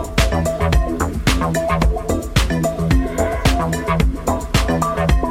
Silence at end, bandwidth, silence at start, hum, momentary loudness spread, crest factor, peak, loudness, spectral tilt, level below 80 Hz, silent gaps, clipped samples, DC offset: 0 s; 16.5 kHz; 0 s; none; 2 LU; 16 dB; 0 dBFS; -18 LUFS; -5.5 dB/octave; -22 dBFS; none; under 0.1%; under 0.1%